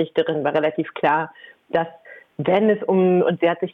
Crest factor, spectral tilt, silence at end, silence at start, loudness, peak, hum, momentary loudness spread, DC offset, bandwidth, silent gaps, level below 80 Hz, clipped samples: 14 dB; -9 dB/octave; 0.05 s; 0 s; -20 LUFS; -6 dBFS; none; 9 LU; under 0.1%; 4.4 kHz; none; -66 dBFS; under 0.1%